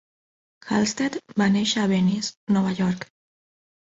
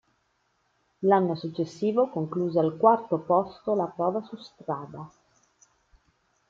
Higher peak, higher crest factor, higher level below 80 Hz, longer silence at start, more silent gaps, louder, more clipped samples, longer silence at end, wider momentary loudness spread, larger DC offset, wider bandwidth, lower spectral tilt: second, -8 dBFS vs -4 dBFS; second, 16 dB vs 22 dB; first, -60 dBFS vs -70 dBFS; second, 0.65 s vs 1 s; first, 2.37-2.47 s vs none; first, -23 LUFS vs -26 LUFS; neither; second, 0.9 s vs 1.4 s; second, 7 LU vs 16 LU; neither; about the same, 8 kHz vs 7.6 kHz; second, -5 dB/octave vs -8 dB/octave